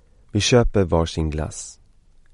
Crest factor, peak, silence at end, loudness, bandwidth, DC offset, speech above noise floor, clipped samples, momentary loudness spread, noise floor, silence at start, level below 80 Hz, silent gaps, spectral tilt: 18 dB; -2 dBFS; 0.6 s; -21 LUFS; 11.5 kHz; under 0.1%; 32 dB; under 0.1%; 15 LU; -52 dBFS; 0.35 s; -32 dBFS; none; -5 dB/octave